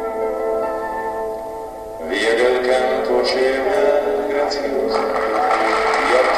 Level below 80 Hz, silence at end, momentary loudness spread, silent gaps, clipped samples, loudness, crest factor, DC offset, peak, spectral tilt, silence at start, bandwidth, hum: -46 dBFS; 0 s; 10 LU; none; under 0.1%; -18 LUFS; 14 dB; under 0.1%; -4 dBFS; -3 dB/octave; 0 s; 14 kHz; none